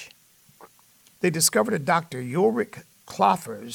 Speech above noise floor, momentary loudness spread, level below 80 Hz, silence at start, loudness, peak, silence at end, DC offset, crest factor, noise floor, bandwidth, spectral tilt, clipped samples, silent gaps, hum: 34 dB; 12 LU; -70 dBFS; 0 s; -23 LUFS; -6 dBFS; 0 s; under 0.1%; 20 dB; -57 dBFS; 19 kHz; -3.5 dB/octave; under 0.1%; none; none